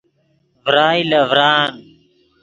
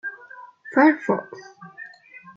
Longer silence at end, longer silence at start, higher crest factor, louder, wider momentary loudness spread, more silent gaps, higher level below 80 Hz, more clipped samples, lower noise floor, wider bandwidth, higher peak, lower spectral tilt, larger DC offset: about the same, 0.6 s vs 0.55 s; first, 0.65 s vs 0.05 s; about the same, 18 dB vs 20 dB; first, -14 LUFS vs -20 LUFS; second, 8 LU vs 24 LU; neither; first, -60 dBFS vs -78 dBFS; neither; first, -61 dBFS vs -47 dBFS; about the same, 7.8 kHz vs 7.2 kHz; first, 0 dBFS vs -4 dBFS; second, -5 dB/octave vs -7 dB/octave; neither